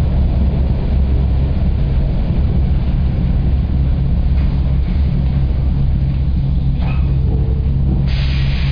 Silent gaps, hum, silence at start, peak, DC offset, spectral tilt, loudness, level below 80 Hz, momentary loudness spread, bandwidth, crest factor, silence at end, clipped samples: none; none; 0 s; -6 dBFS; 1%; -10 dB/octave; -17 LUFS; -16 dBFS; 1 LU; 5.2 kHz; 8 dB; 0 s; under 0.1%